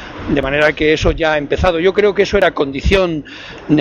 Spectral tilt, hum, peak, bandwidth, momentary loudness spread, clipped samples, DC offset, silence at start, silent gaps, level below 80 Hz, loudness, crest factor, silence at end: -6 dB/octave; none; 0 dBFS; 9 kHz; 6 LU; under 0.1%; under 0.1%; 0 s; none; -28 dBFS; -14 LUFS; 14 dB; 0 s